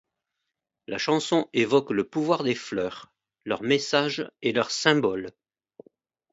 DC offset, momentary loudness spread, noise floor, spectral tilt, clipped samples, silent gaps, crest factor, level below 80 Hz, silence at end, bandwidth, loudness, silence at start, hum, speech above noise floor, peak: under 0.1%; 12 LU; -84 dBFS; -4.5 dB/octave; under 0.1%; none; 24 dB; -68 dBFS; 1.05 s; 8 kHz; -25 LUFS; 0.9 s; none; 59 dB; -4 dBFS